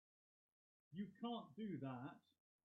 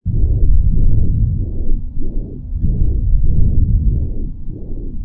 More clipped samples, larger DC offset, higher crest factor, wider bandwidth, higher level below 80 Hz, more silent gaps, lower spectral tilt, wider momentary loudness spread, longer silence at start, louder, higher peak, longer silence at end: neither; neither; about the same, 16 dB vs 12 dB; first, 4.3 kHz vs 0.8 kHz; second, under -90 dBFS vs -14 dBFS; neither; second, -6 dB/octave vs -15.5 dB/octave; second, 9 LU vs 12 LU; first, 0.9 s vs 0.05 s; second, -52 LUFS vs -19 LUFS; second, -38 dBFS vs 0 dBFS; first, 0.45 s vs 0 s